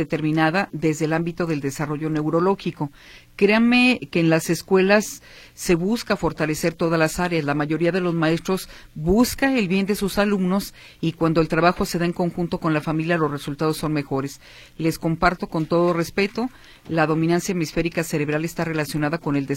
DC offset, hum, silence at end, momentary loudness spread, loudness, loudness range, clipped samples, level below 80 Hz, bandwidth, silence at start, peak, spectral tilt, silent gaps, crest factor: under 0.1%; none; 0 s; 9 LU; -22 LUFS; 4 LU; under 0.1%; -44 dBFS; 16.5 kHz; 0 s; -2 dBFS; -5.5 dB/octave; none; 18 dB